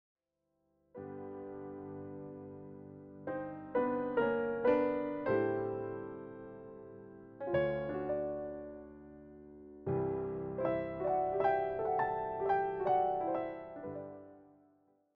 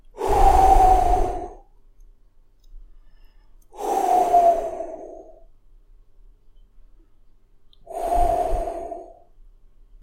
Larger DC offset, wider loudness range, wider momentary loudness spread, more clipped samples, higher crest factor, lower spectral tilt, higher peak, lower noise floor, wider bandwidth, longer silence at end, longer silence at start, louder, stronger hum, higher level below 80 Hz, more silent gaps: neither; second, 6 LU vs 10 LU; about the same, 20 LU vs 21 LU; neither; about the same, 20 dB vs 18 dB; about the same, -6.5 dB/octave vs -6 dB/octave; second, -16 dBFS vs -4 dBFS; first, -83 dBFS vs -53 dBFS; second, 5.2 kHz vs 16.5 kHz; second, 0.7 s vs 1 s; first, 0.95 s vs 0.15 s; second, -36 LUFS vs -20 LUFS; neither; second, -66 dBFS vs -30 dBFS; neither